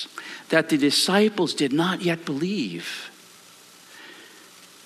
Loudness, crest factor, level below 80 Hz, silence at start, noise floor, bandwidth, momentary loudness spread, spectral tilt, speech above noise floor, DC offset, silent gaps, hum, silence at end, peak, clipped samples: -23 LUFS; 20 dB; -72 dBFS; 0 s; -49 dBFS; 14 kHz; 24 LU; -4 dB/octave; 27 dB; under 0.1%; none; none; 0.2 s; -4 dBFS; under 0.1%